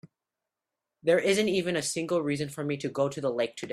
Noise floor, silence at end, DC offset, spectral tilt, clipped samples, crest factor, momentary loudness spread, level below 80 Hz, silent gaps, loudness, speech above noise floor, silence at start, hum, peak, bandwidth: -88 dBFS; 0 s; under 0.1%; -4.5 dB/octave; under 0.1%; 18 dB; 8 LU; -68 dBFS; none; -28 LUFS; 60 dB; 1.05 s; none; -12 dBFS; 14.5 kHz